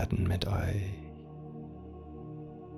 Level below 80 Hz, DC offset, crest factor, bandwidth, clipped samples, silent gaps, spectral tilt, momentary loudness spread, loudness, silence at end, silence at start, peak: -48 dBFS; under 0.1%; 20 dB; 13 kHz; under 0.1%; none; -7 dB/octave; 16 LU; -36 LUFS; 0 s; 0 s; -14 dBFS